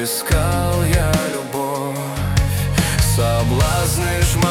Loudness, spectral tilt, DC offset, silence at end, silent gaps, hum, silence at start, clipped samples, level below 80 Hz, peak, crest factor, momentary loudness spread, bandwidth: -18 LUFS; -4.5 dB/octave; under 0.1%; 0 s; none; none; 0 s; under 0.1%; -26 dBFS; -4 dBFS; 12 dB; 6 LU; 18 kHz